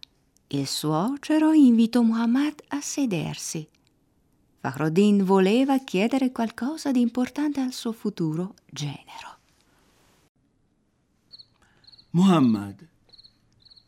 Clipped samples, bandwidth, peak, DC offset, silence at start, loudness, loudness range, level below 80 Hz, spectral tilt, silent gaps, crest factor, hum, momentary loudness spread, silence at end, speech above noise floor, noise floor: under 0.1%; 15.5 kHz; -8 dBFS; under 0.1%; 0.55 s; -23 LUFS; 12 LU; -68 dBFS; -6 dB/octave; 10.29-10.35 s; 16 dB; none; 15 LU; 1.15 s; 45 dB; -68 dBFS